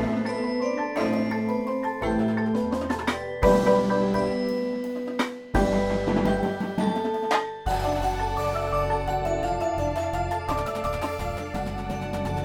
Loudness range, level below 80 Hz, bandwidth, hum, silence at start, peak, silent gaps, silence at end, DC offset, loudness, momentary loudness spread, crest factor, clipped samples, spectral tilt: 3 LU; -38 dBFS; 18 kHz; none; 0 s; -6 dBFS; none; 0 s; under 0.1%; -26 LUFS; 6 LU; 18 dB; under 0.1%; -6.5 dB/octave